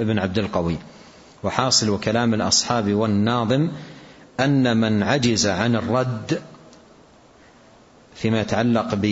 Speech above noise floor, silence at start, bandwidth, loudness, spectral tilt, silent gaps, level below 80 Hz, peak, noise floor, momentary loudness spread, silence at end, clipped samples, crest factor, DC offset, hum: 30 dB; 0 s; 8 kHz; -21 LUFS; -4.5 dB/octave; none; -52 dBFS; 0 dBFS; -50 dBFS; 10 LU; 0 s; under 0.1%; 22 dB; under 0.1%; none